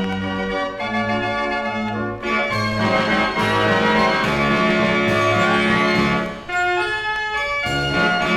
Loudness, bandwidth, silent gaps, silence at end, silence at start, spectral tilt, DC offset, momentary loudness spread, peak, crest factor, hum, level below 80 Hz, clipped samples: -19 LUFS; 14 kHz; none; 0 s; 0 s; -5 dB/octave; under 0.1%; 7 LU; -4 dBFS; 16 dB; none; -42 dBFS; under 0.1%